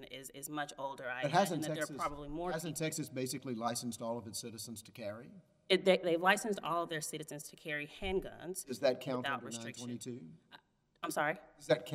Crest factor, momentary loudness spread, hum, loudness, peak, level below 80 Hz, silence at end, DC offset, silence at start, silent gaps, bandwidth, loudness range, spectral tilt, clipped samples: 24 dB; 15 LU; none; -37 LUFS; -14 dBFS; -62 dBFS; 0 s; under 0.1%; 0 s; none; 16 kHz; 5 LU; -4 dB/octave; under 0.1%